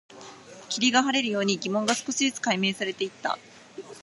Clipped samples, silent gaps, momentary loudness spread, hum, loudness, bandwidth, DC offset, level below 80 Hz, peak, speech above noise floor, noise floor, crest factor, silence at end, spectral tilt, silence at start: under 0.1%; none; 23 LU; none; -26 LUFS; 11.5 kHz; under 0.1%; -76 dBFS; -6 dBFS; 20 dB; -46 dBFS; 20 dB; 0 s; -3 dB/octave; 0.1 s